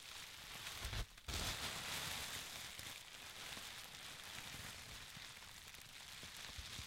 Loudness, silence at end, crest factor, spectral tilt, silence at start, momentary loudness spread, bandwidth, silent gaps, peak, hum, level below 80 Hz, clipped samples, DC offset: -48 LUFS; 0 s; 22 dB; -1.5 dB/octave; 0 s; 9 LU; 16.5 kHz; none; -28 dBFS; none; -60 dBFS; under 0.1%; under 0.1%